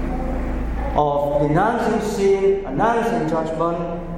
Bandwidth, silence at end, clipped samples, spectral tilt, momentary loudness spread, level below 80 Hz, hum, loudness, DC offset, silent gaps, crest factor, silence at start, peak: 15.5 kHz; 0 s; under 0.1%; -7 dB/octave; 8 LU; -30 dBFS; none; -20 LUFS; under 0.1%; none; 14 dB; 0 s; -4 dBFS